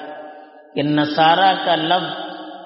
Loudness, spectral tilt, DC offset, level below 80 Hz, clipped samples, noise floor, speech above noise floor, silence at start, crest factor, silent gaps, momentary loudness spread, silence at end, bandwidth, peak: -17 LUFS; -2 dB/octave; under 0.1%; -66 dBFS; under 0.1%; -40 dBFS; 24 dB; 0 s; 18 dB; none; 20 LU; 0 s; 5.8 kHz; -2 dBFS